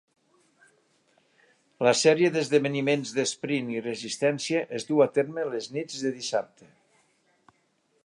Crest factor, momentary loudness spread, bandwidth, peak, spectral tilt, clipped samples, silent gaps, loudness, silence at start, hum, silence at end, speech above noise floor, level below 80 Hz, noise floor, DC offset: 20 dB; 11 LU; 11.5 kHz; -8 dBFS; -4 dB/octave; under 0.1%; none; -26 LUFS; 1.8 s; none; 1.6 s; 44 dB; -78 dBFS; -70 dBFS; under 0.1%